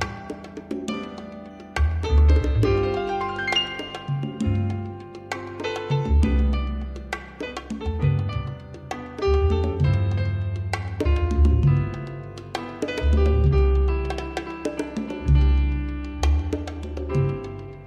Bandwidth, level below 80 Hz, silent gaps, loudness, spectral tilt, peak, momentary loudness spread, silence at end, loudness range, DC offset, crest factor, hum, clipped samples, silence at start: 9.2 kHz; -26 dBFS; none; -24 LUFS; -7 dB/octave; -8 dBFS; 14 LU; 0 s; 4 LU; under 0.1%; 14 dB; none; under 0.1%; 0 s